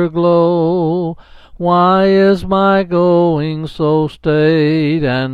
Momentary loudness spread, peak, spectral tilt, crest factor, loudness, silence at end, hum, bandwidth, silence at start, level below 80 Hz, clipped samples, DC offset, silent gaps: 8 LU; 0 dBFS; -9 dB/octave; 12 dB; -13 LUFS; 0 s; none; 7.4 kHz; 0 s; -42 dBFS; under 0.1%; under 0.1%; none